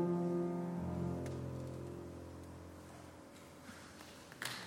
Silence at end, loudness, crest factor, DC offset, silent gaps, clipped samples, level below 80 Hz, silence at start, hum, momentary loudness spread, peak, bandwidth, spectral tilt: 0 s; -44 LUFS; 18 dB; under 0.1%; none; under 0.1%; -64 dBFS; 0 s; none; 17 LU; -26 dBFS; 16.5 kHz; -6.5 dB/octave